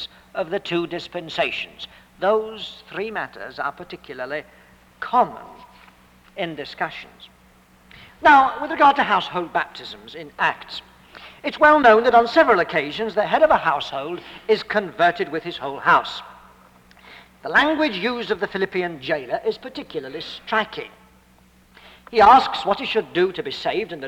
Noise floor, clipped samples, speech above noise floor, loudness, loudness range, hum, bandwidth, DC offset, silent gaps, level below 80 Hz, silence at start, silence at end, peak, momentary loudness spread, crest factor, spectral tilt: -54 dBFS; under 0.1%; 33 dB; -20 LUFS; 10 LU; none; 16.5 kHz; under 0.1%; none; -54 dBFS; 0 s; 0 s; -4 dBFS; 18 LU; 18 dB; -5 dB/octave